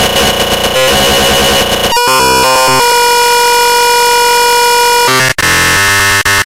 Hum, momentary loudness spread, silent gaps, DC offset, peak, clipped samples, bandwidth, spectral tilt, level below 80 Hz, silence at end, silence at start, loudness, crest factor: none; 2 LU; none; 2%; 0 dBFS; under 0.1%; 17 kHz; -1.5 dB/octave; -30 dBFS; 0 s; 0 s; -7 LUFS; 8 dB